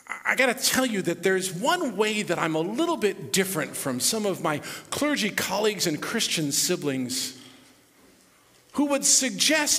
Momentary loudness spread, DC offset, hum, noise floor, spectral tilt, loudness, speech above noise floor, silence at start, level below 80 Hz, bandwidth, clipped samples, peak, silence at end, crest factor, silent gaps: 7 LU; under 0.1%; none; -58 dBFS; -2.5 dB/octave; -24 LUFS; 33 dB; 0.1 s; -66 dBFS; 16 kHz; under 0.1%; -6 dBFS; 0 s; 20 dB; none